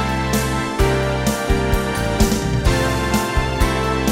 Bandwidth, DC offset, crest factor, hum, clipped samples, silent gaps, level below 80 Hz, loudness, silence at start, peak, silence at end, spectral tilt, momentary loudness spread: 16.5 kHz; under 0.1%; 16 dB; none; under 0.1%; none; -24 dBFS; -19 LUFS; 0 s; -2 dBFS; 0 s; -5 dB/octave; 2 LU